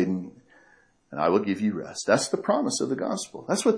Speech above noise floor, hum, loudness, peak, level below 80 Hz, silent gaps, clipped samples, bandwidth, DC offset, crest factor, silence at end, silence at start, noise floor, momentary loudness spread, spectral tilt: 35 dB; none; -26 LUFS; -6 dBFS; -70 dBFS; none; under 0.1%; 11 kHz; under 0.1%; 20 dB; 0 s; 0 s; -60 dBFS; 9 LU; -4.5 dB/octave